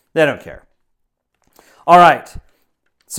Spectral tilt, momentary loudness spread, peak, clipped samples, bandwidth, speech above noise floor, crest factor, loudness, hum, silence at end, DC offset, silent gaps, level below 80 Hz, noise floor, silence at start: -4.5 dB/octave; 18 LU; 0 dBFS; under 0.1%; 16 kHz; 58 dB; 16 dB; -12 LUFS; none; 0 s; under 0.1%; none; -46 dBFS; -70 dBFS; 0.15 s